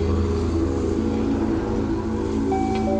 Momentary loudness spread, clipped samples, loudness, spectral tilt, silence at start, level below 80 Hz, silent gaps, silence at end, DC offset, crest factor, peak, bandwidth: 2 LU; under 0.1%; -23 LUFS; -8 dB/octave; 0 s; -32 dBFS; none; 0 s; under 0.1%; 12 dB; -10 dBFS; 8.8 kHz